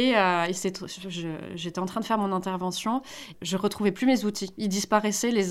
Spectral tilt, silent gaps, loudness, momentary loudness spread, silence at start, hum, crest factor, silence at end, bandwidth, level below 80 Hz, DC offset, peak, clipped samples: -4 dB/octave; none; -27 LUFS; 11 LU; 0 s; none; 18 dB; 0 s; 16 kHz; -64 dBFS; under 0.1%; -8 dBFS; under 0.1%